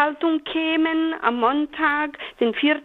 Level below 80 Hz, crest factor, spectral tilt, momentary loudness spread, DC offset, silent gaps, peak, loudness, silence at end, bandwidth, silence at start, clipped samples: -60 dBFS; 16 dB; -6 dB/octave; 4 LU; under 0.1%; none; -4 dBFS; -22 LUFS; 0 s; 4.2 kHz; 0 s; under 0.1%